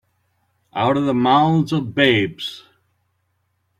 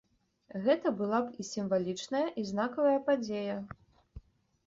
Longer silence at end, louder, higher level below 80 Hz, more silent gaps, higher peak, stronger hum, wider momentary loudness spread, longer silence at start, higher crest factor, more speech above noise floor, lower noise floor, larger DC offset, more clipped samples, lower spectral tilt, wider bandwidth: first, 1.2 s vs 0.45 s; first, -18 LUFS vs -32 LUFS; first, -56 dBFS vs -64 dBFS; neither; first, -2 dBFS vs -14 dBFS; neither; first, 15 LU vs 9 LU; first, 0.75 s vs 0.55 s; about the same, 18 dB vs 18 dB; first, 51 dB vs 28 dB; first, -69 dBFS vs -60 dBFS; neither; neither; about the same, -6.5 dB/octave vs -5.5 dB/octave; first, 13.5 kHz vs 8 kHz